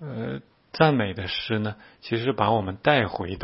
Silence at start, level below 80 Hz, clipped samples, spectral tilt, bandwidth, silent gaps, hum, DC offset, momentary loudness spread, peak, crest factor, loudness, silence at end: 0 s; -54 dBFS; under 0.1%; -10 dB/octave; 5.8 kHz; none; none; under 0.1%; 13 LU; -2 dBFS; 22 dB; -25 LUFS; 0 s